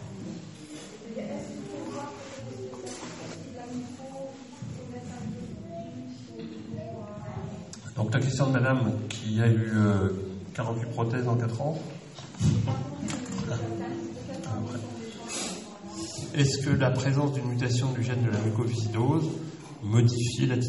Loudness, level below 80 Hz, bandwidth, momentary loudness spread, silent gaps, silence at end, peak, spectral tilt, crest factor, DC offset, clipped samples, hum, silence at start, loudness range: -30 LUFS; -58 dBFS; 11.5 kHz; 16 LU; none; 0 s; -10 dBFS; -6 dB/octave; 20 dB; under 0.1%; under 0.1%; none; 0 s; 13 LU